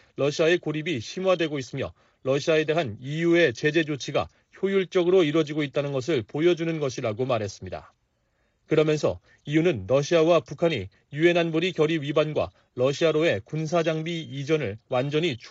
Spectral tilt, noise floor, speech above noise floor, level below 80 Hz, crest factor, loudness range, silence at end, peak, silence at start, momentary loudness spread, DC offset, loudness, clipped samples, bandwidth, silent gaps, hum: -5 dB/octave; -70 dBFS; 46 dB; -62 dBFS; 16 dB; 3 LU; 0 s; -8 dBFS; 0.2 s; 10 LU; under 0.1%; -25 LUFS; under 0.1%; 8 kHz; none; none